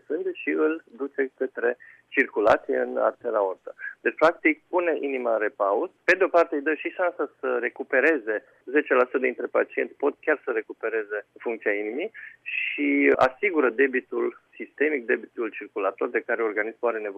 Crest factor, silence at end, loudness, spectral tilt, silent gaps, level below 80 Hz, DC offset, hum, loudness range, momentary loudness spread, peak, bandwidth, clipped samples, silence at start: 18 dB; 0 s; -25 LUFS; -5.5 dB/octave; none; -66 dBFS; under 0.1%; none; 3 LU; 10 LU; -8 dBFS; 8.2 kHz; under 0.1%; 0.1 s